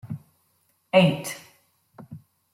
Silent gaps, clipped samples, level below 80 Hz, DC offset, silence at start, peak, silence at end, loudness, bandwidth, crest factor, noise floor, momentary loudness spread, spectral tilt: none; under 0.1%; -66 dBFS; under 0.1%; 0.05 s; -6 dBFS; 0.35 s; -22 LUFS; 16 kHz; 22 dB; -68 dBFS; 26 LU; -5.5 dB/octave